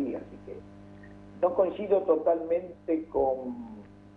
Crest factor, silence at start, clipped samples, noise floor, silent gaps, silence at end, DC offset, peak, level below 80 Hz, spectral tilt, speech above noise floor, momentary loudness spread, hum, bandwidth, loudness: 18 dB; 0 s; under 0.1%; -48 dBFS; none; 0.05 s; under 0.1%; -12 dBFS; -58 dBFS; -9 dB/octave; 21 dB; 23 LU; 50 Hz at -55 dBFS; 4.2 kHz; -28 LUFS